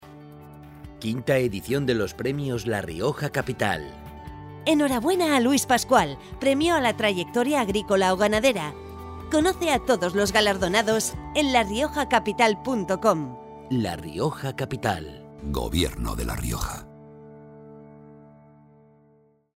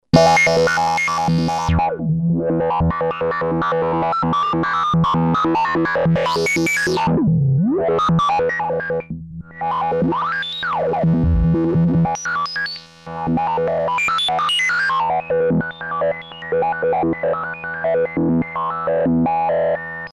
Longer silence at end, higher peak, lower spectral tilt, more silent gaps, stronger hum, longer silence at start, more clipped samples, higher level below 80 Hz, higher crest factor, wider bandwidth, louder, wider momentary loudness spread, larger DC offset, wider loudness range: first, 1.4 s vs 0 s; second, -4 dBFS vs 0 dBFS; second, -4.5 dB/octave vs -6 dB/octave; neither; neither; second, 0 s vs 0.15 s; neither; second, -42 dBFS vs -36 dBFS; about the same, 20 dB vs 18 dB; first, 16 kHz vs 12.5 kHz; second, -24 LUFS vs -18 LUFS; first, 17 LU vs 6 LU; neither; first, 8 LU vs 3 LU